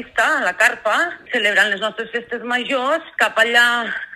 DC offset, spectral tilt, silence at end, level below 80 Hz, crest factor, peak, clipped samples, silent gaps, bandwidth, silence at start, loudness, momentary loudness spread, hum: under 0.1%; -1.5 dB/octave; 0 s; -62 dBFS; 18 dB; 0 dBFS; under 0.1%; none; 16 kHz; 0 s; -17 LUFS; 9 LU; none